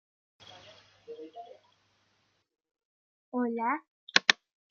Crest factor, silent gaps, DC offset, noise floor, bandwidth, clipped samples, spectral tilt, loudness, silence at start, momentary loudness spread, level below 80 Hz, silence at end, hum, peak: 34 dB; 2.85-3.32 s, 3.88-4.07 s; under 0.1%; -74 dBFS; 7.4 kHz; under 0.1%; -1 dB/octave; -29 LUFS; 0.5 s; 26 LU; -88 dBFS; 0.35 s; none; -2 dBFS